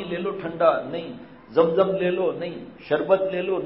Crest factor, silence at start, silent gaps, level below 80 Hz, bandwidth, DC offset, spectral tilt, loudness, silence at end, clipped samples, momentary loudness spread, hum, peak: 18 dB; 0 s; none; -62 dBFS; 5.8 kHz; under 0.1%; -10.5 dB/octave; -23 LUFS; 0 s; under 0.1%; 13 LU; none; -6 dBFS